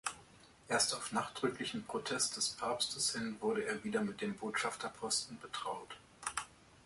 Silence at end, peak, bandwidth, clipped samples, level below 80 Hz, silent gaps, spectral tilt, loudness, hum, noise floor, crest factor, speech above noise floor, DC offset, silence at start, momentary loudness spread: 0.1 s; -20 dBFS; 12 kHz; under 0.1%; -72 dBFS; none; -2 dB/octave; -37 LUFS; none; -61 dBFS; 20 dB; 23 dB; under 0.1%; 0.05 s; 10 LU